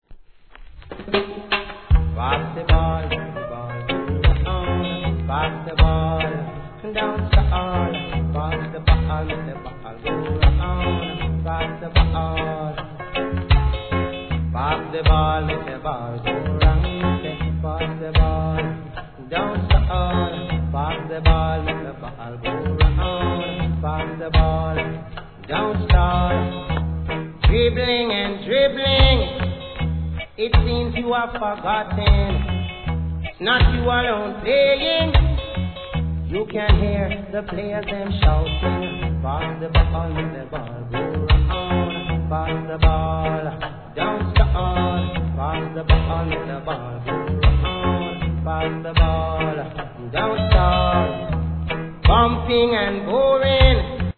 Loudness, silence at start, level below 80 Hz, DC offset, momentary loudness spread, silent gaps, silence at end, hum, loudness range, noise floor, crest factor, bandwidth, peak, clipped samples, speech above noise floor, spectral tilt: -21 LUFS; 0.1 s; -24 dBFS; 0.3%; 10 LU; none; 0.05 s; none; 3 LU; -43 dBFS; 20 dB; 4.5 kHz; 0 dBFS; under 0.1%; 24 dB; -9.5 dB/octave